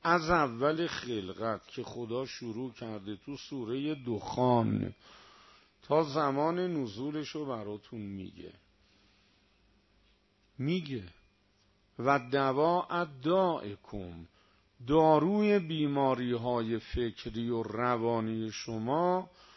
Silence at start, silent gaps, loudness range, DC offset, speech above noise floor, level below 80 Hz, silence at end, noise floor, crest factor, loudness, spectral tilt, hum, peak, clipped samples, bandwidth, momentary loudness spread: 0.05 s; none; 12 LU; under 0.1%; 38 dB; -58 dBFS; 0.3 s; -69 dBFS; 20 dB; -32 LUFS; -6.5 dB/octave; none; -12 dBFS; under 0.1%; 6.2 kHz; 15 LU